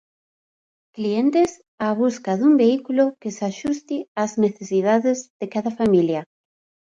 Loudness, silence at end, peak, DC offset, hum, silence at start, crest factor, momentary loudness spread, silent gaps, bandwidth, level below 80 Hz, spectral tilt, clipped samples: -21 LUFS; 0.6 s; -6 dBFS; under 0.1%; none; 0.95 s; 16 dB; 10 LU; 1.68-1.78 s, 4.08-4.15 s, 5.30-5.40 s; 9 kHz; -62 dBFS; -6 dB/octave; under 0.1%